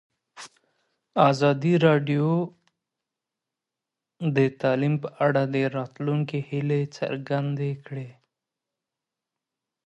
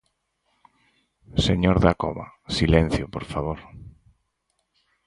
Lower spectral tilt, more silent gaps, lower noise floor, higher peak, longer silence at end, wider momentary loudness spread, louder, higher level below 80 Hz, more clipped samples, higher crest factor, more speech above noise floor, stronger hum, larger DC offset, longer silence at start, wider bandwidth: about the same, -7.5 dB/octave vs -6.5 dB/octave; neither; first, -87 dBFS vs -74 dBFS; about the same, -4 dBFS vs -2 dBFS; first, 1.75 s vs 1.15 s; first, 17 LU vs 14 LU; about the same, -24 LUFS vs -23 LUFS; second, -72 dBFS vs -36 dBFS; neither; about the same, 22 dB vs 24 dB; first, 64 dB vs 52 dB; neither; neither; second, 0.35 s vs 1.35 s; second, 8.4 kHz vs 11.5 kHz